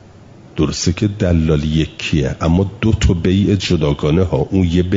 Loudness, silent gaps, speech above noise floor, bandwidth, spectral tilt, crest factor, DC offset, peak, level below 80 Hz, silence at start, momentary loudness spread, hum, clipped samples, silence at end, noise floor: -16 LUFS; none; 26 dB; 7.8 kHz; -6.5 dB/octave; 12 dB; under 0.1%; -2 dBFS; -30 dBFS; 0.55 s; 4 LU; none; under 0.1%; 0 s; -40 dBFS